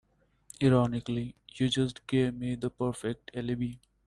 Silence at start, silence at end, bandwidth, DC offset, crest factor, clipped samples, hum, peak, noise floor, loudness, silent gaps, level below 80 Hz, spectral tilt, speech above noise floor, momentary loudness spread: 0.6 s; 0.3 s; 11.5 kHz; under 0.1%; 20 dB; under 0.1%; none; -12 dBFS; -57 dBFS; -31 LUFS; none; -56 dBFS; -6.5 dB/octave; 27 dB; 11 LU